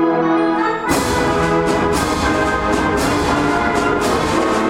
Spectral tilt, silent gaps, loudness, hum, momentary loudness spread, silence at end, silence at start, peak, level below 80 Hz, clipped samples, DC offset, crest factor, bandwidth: -5 dB/octave; none; -16 LUFS; none; 1 LU; 0 s; 0 s; -4 dBFS; -32 dBFS; under 0.1%; under 0.1%; 12 dB; 16.5 kHz